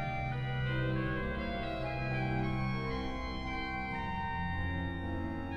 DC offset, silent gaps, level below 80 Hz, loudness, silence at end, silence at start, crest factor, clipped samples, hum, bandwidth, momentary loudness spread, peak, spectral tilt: under 0.1%; none; -44 dBFS; -36 LUFS; 0 s; 0 s; 14 dB; under 0.1%; none; 6.6 kHz; 4 LU; -22 dBFS; -7.5 dB/octave